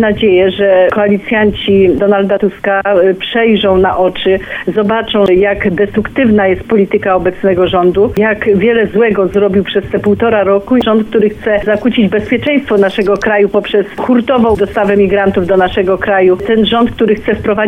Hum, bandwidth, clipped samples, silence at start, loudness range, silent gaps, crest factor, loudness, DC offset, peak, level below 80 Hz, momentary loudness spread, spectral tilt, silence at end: none; 6.4 kHz; under 0.1%; 0 s; 1 LU; none; 10 dB; -10 LUFS; under 0.1%; 0 dBFS; -34 dBFS; 4 LU; -7.5 dB/octave; 0 s